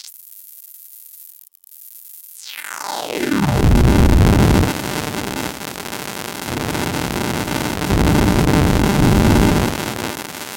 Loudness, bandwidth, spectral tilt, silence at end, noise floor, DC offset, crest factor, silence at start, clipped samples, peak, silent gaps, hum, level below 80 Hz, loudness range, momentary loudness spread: -17 LUFS; 17 kHz; -5.5 dB/octave; 0 s; -44 dBFS; under 0.1%; 16 dB; 0.05 s; under 0.1%; 0 dBFS; none; none; -24 dBFS; 7 LU; 23 LU